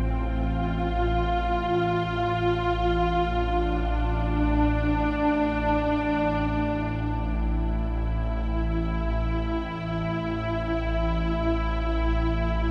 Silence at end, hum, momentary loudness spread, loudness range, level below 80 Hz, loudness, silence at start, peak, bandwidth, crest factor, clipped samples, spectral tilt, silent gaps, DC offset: 0 s; none; 4 LU; 3 LU; -28 dBFS; -26 LUFS; 0 s; -12 dBFS; 6 kHz; 12 dB; under 0.1%; -8.5 dB/octave; none; under 0.1%